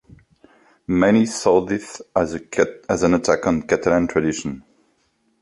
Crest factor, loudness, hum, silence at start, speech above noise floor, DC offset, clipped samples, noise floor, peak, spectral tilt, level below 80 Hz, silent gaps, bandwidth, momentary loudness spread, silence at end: 20 dB; -20 LUFS; none; 0.9 s; 46 dB; under 0.1%; under 0.1%; -65 dBFS; -2 dBFS; -5.5 dB/octave; -48 dBFS; none; 11.5 kHz; 10 LU; 0.8 s